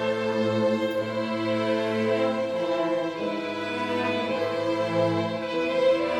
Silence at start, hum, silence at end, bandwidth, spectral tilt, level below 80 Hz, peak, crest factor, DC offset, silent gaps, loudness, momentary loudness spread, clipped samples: 0 s; none; 0 s; 11 kHz; -6 dB/octave; -68 dBFS; -12 dBFS; 14 dB; under 0.1%; none; -26 LUFS; 4 LU; under 0.1%